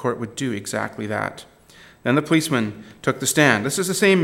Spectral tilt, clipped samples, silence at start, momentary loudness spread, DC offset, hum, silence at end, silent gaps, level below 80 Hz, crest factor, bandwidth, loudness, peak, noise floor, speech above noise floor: -4 dB/octave; under 0.1%; 0 s; 11 LU; under 0.1%; none; 0 s; none; -62 dBFS; 20 dB; 17 kHz; -21 LUFS; 0 dBFS; -49 dBFS; 28 dB